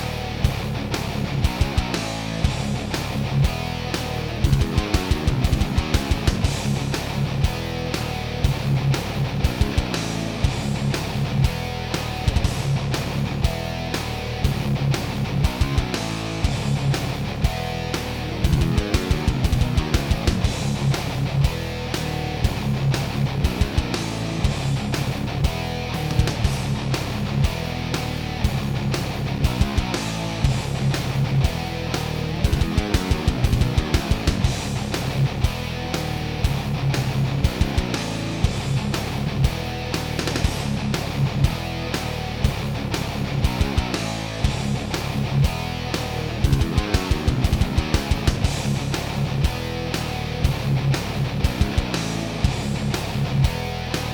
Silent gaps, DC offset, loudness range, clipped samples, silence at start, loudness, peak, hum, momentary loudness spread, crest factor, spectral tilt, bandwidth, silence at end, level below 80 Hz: none; under 0.1%; 2 LU; under 0.1%; 0 s; -23 LUFS; -4 dBFS; none; 4 LU; 18 dB; -5.5 dB/octave; over 20 kHz; 0 s; -28 dBFS